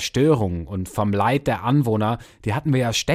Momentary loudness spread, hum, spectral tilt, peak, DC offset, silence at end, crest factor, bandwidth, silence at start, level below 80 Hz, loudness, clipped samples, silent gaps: 8 LU; none; -5.5 dB/octave; -6 dBFS; under 0.1%; 0 s; 16 dB; 15.5 kHz; 0 s; -46 dBFS; -21 LUFS; under 0.1%; none